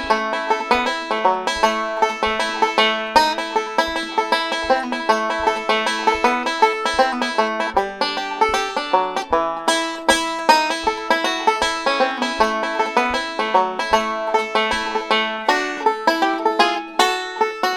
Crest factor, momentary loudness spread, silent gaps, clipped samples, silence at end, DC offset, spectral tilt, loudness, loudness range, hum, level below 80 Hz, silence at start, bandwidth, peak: 20 dB; 4 LU; none; under 0.1%; 0 s; under 0.1%; -2 dB/octave; -19 LUFS; 1 LU; none; -48 dBFS; 0 s; 17.5 kHz; 0 dBFS